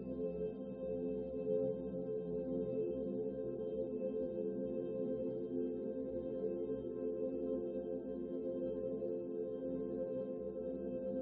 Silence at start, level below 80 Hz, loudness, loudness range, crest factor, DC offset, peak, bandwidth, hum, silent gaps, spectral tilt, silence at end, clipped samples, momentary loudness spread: 0 s; -64 dBFS; -41 LUFS; 1 LU; 14 dB; under 0.1%; -26 dBFS; 3.9 kHz; none; none; -10.5 dB/octave; 0 s; under 0.1%; 3 LU